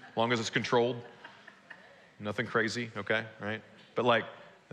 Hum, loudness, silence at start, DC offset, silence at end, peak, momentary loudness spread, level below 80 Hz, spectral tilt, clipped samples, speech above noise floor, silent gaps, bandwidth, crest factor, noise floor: none; -32 LUFS; 0 s; under 0.1%; 0.25 s; -14 dBFS; 23 LU; -80 dBFS; -4.5 dB/octave; under 0.1%; 23 dB; none; 11 kHz; 20 dB; -54 dBFS